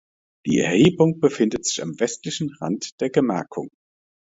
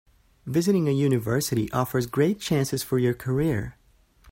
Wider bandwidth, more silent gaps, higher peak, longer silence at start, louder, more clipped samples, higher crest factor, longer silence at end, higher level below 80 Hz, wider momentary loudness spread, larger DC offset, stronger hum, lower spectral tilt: second, 8 kHz vs 16.5 kHz; first, 2.92-2.98 s vs none; first, -4 dBFS vs -10 dBFS; about the same, 0.45 s vs 0.45 s; first, -21 LUFS vs -25 LUFS; neither; about the same, 18 dB vs 16 dB; first, 0.65 s vs 0 s; second, -58 dBFS vs -52 dBFS; first, 14 LU vs 5 LU; neither; neither; about the same, -5 dB/octave vs -6 dB/octave